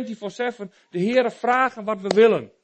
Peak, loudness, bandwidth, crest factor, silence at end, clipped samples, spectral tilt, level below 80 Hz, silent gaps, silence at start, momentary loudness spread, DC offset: -4 dBFS; -21 LUFS; 8.6 kHz; 18 dB; 0.15 s; under 0.1%; -5.5 dB/octave; -70 dBFS; none; 0 s; 14 LU; under 0.1%